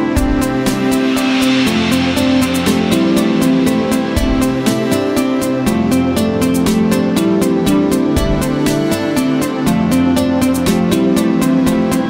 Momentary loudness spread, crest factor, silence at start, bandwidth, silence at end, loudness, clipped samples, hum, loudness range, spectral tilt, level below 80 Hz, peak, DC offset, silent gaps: 2 LU; 12 dB; 0 s; 16.5 kHz; 0 s; -14 LUFS; under 0.1%; none; 1 LU; -5.5 dB/octave; -28 dBFS; 0 dBFS; under 0.1%; none